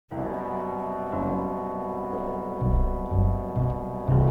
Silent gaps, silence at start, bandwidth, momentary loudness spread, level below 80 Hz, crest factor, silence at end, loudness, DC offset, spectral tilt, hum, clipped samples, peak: none; 0.1 s; 3.7 kHz; 6 LU; -32 dBFS; 16 dB; 0 s; -28 LUFS; 0.1%; -11 dB/octave; none; under 0.1%; -10 dBFS